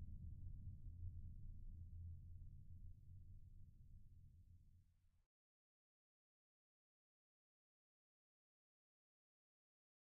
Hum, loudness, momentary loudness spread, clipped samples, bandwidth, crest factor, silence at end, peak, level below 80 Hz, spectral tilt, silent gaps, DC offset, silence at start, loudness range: none; -60 LUFS; 11 LU; under 0.1%; 0.7 kHz; 18 dB; 4.9 s; -40 dBFS; -62 dBFS; -21 dB/octave; none; under 0.1%; 0 s; 9 LU